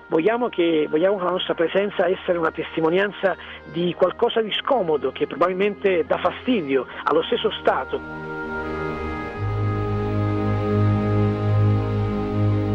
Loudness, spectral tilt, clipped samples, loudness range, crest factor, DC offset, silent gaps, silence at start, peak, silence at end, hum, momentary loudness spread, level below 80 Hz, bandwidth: -22 LUFS; -8.5 dB/octave; under 0.1%; 3 LU; 14 dB; under 0.1%; none; 0 s; -8 dBFS; 0 s; none; 7 LU; -42 dBFS; 5.8 kHz